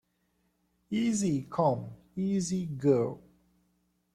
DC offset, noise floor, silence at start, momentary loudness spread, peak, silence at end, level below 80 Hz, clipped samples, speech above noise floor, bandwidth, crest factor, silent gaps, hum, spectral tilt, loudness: under 0.1%; -75 dBFS; 0.9 s; 9 LU; -12 dBFS; 0.95 s; -66 dBFS; under 0.1%; 46 dB; 13 kHz; 18 dB; none; none; -6.5 dB/octave; -30 LUFS